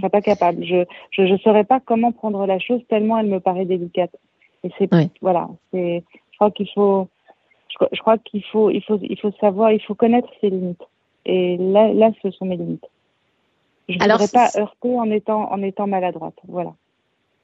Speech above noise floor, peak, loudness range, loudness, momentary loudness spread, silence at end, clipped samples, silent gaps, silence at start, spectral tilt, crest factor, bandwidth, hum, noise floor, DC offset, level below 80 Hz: 50 dB; -2 dBFS; 3 LU; -19 LUFS; 13 LU; 0.7 s; under 0.1%; none; 0 s; -7 dB/octave; 18 dB; 8 kHz; none; -68 dBFS; under 0.1%; -66 dBFS